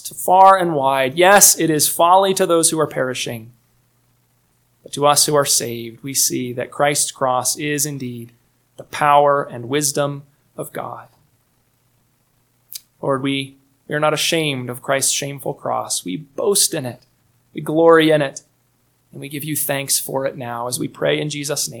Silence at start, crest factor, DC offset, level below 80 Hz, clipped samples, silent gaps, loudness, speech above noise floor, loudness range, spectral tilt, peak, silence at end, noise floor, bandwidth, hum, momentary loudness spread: 0.05 s; 18 dB; under 0.1%; -64 dBFS; under 0.1%; none; -16 LUFS; 44 dB; 10 LU; -2.5 dB/octave; 0 dBFS; 0 s; -62 dBFS; 19 kHz; none; 19 LU